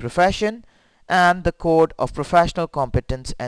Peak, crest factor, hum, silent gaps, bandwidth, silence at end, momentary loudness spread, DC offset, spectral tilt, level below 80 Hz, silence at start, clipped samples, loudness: -4 dBFS; 16 dB; none; none; 11 kHz; 0 s; 8 LU; under 0.1%; -5.5 dB/octave; -36 dBFS; 0 s; under 0.1%; -20 LUFS